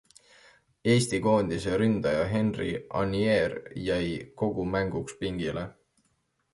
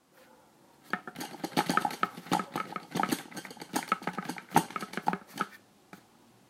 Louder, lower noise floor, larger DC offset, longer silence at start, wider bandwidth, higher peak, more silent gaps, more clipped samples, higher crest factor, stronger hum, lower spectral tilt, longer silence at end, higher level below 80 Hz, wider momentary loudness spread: first, -28 LUFS vs -34 LUFS; first, -73 dBFS vs -61 dBFS; neither; first, 0.85 s vs 0.2 s; second, 11.5 kHz vs 16 kHz; about the same, -10 dBFS vs -8 dBFS; neither; neither; second, 18 dB vs 28 dB; neither; first, -6 dB/octave vs -4 dB/octave; first, 0.8 s vs 0.5 s; first, -50 dBFS vs -74 dBFS; about the same, 9 LU vs 9 LU